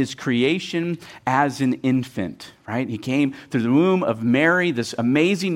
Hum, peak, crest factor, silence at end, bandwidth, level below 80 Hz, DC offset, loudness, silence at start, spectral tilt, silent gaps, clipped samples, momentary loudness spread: none; -4 dBFS; 16 dB; 0 s; 15 kHz; -62 dBFS; under 0.1%; -21 LUFS; 0 s; -6 dB/octave; none; under 0.1%; 11 LU